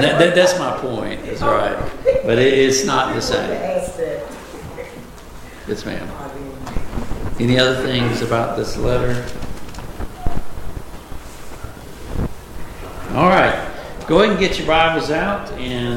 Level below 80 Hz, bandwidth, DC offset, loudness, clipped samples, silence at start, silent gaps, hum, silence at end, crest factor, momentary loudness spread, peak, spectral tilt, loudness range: -32 dBFS; 17 kHz; under 0.1%; -18 LUFS; under 0.1%; 0 s; none; none; 0 s; 18 dB; 21 LU; 0 dBFS; -4.5 dB/octave; 13 LU